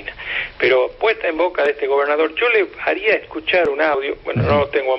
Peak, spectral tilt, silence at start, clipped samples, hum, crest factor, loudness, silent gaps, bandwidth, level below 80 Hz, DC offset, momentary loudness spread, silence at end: -4 dBFS; -7.5 dB/octave; 0 s; under 0.1%; none; 14 dB; -18 LUFS; none; 5.8 kHz; -46 dBFS; under 0.1%; 5 LU; 0 s